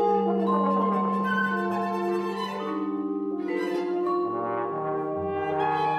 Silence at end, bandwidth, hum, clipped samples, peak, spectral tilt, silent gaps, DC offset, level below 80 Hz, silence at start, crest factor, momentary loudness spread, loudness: 0 s; 13 kHz; none; under 0.1%; -12 dBFS; -7.5 dB/octave; none; under 0.1%; -68 dBFS; 0 s; 14 dB; 6 LU; -27 LUFS